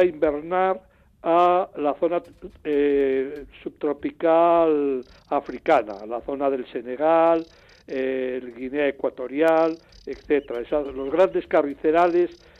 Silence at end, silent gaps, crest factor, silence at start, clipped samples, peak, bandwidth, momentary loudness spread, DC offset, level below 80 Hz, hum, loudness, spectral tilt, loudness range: 0.25 s; none; 16 dB; 0 s; under 0.1%; -8 dBFS; 7.8 kHz; 13 LU; under 0.1%; -56 dBFS; none; -23 LUFS; -7 dB/octave; 3 LU